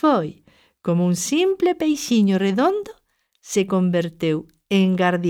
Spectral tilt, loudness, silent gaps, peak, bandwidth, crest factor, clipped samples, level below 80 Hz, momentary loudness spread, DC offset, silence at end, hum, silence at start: -5.5 dB/octave; -20 LUFS; none; -6 dBFS; 16 kHz; 14 dB; under 0.1%; -60 dBFS; 9 LU; under 0.1%; 0 s; none; 0.05 s